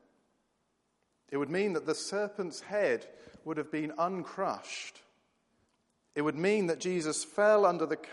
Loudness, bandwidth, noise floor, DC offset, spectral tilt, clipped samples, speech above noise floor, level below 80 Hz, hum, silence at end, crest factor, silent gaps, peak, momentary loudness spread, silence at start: -32 LUFS; 11.5 kHz; -78 dBFS; under 0.1%; -4.5 dB/octave; under 0.1%; 46 dB; -80 dBFS; none; 0 s; 20 dB; none; -14 dBFS; 13 LU; 1.3 s